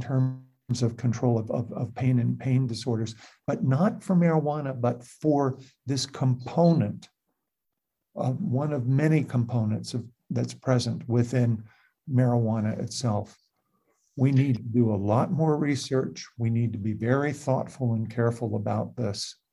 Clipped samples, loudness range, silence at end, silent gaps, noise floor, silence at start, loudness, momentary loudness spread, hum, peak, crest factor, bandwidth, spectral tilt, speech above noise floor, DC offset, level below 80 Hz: under 0.1%; 2 LU; 0.2 s; none; -84 dBFS; 0 s; -27 LUFS; 9 LU; none; -8 dBFS; 18 dB; 11.5 kHz; -7 dB/octave; 58 dB; under 0.1%; -58 dBFS